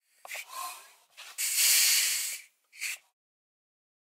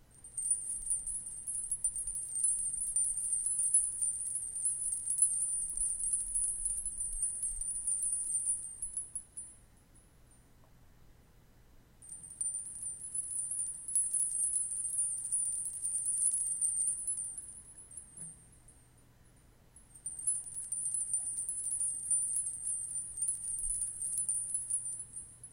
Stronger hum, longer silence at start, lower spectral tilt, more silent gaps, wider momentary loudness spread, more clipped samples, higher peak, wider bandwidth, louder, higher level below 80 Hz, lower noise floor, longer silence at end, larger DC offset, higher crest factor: neither; first, 0.3 s vs 0.15 s; second, 7.5 dB/octave vs -0.5 dB/octave; neither; first, 21 LU vs 13 LU; neither; first, -12 dBFS vs -16 dBFS; about the same, 16 kHz vs 17 kHz; first, -25 LUFS vs -33 LUFS; second, under -90 dBFS vs -58 dBFS; second, -52 dBFS vs -62 dBFS; first, 1.05 s vs 0 s; neither; about the same, 20 dB vs 20 dB